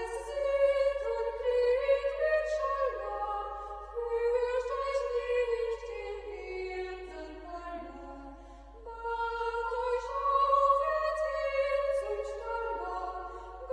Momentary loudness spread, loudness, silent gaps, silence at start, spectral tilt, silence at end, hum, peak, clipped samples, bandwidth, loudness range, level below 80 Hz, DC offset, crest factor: 16 LU; -32 LUFS; none; 0 s; -4.5 dB/octave; 0 s; none; -16 dBFS; under 0.1%; 10.5 kHz; 9 LU; -52 dBFS; under 0.1%; 16 dB